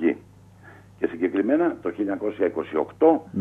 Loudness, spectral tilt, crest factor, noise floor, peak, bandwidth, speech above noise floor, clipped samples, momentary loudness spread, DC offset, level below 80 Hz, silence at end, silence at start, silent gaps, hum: -24 LUFS; -8.5 dB/octave; 18 dB; -49 dBFS; -6 dBFS; 3.8 kHz; 26 dB; under 0.1%; 9 LU; under 0.1%; -64 dBFS; 0 s; 0 s; none; 50 Hz at -55 dBFS